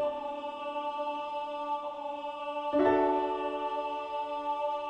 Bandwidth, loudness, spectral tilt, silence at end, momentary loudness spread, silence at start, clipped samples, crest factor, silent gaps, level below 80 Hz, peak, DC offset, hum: 9 kHz; -33 LUFS; -5.5 dB/octave; 0 s; 11 LU; 0 s; under 0.1%; 18 dB; none; -66 dBFS; -14 dBFS; under 0.1%; none